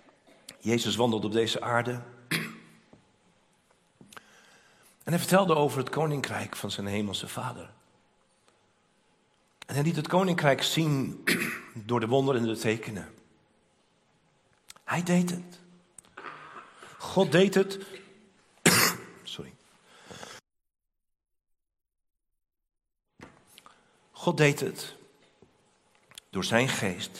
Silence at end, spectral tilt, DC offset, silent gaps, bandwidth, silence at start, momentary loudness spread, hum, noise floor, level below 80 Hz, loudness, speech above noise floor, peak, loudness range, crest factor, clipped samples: 0 s; -4.5 dB/octave; under 0.1%; none; 16 kHz; 0.5 s; 22 LU; none; -68 dBFS; -70 dBFS; -27 LUFS; 40 dB; -4 dBFS; 9 LU; 26 dB; under 0.1%